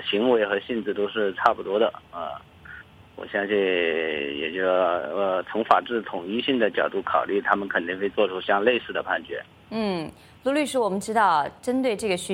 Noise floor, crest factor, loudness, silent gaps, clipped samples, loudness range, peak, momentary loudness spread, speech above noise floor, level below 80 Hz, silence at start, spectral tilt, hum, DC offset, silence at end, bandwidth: -45 dBFS; 22 dB; -24 LUFS; none; under 0.1%; 2 LU; -2 dBFS; 13 LU; 21 dB; -62 dBFS; 0 s; -4.5 dB/octave; none; under 0.1%; 0 s; 16 kHz